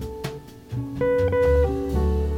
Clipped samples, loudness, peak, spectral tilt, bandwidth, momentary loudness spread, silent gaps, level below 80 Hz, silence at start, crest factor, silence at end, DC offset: under 0.1%; -23 LUFS; -10 dBFS; -8 dB/octave; 14.5 kHz; 15 LU; none; -28 dBFS; 0 s; 14 dB; 0 s; under 0.1%